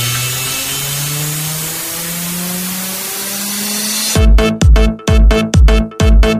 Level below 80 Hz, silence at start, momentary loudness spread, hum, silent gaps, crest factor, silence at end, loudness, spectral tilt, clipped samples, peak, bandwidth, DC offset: -14 dBFS; 0 s; 7 LU; none; none; 12 dB; 0 s; -14 LUFS; -4 dB/octave; under 0.1%; 0 dBFS; 16 kHz; under 0.1%